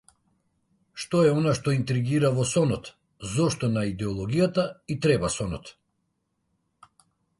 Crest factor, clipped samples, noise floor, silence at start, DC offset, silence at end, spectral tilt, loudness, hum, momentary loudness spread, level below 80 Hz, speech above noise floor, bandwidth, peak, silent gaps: 18 dB; under 0.1%; -76 dBFS; 0.95 s; under 0.1%; 1.7 s; -6 dB/octave; -25 LUFS; none; 12 LU; -52 dBFS; 51 dB; 11.5 kHz; -10 dBFS; none